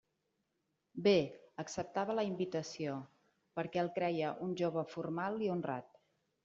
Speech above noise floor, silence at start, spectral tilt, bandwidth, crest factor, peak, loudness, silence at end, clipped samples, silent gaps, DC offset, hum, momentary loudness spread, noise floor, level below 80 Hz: 47 dB; 0.95 s; -5 dB/octave; 7.6 kHz; 20 dB; -18 dBFS; -38 LUFS; 0.6 s; under 0.1%; none; under 0.1%; none; 12 LU; -84 dBFS; -76 dBFS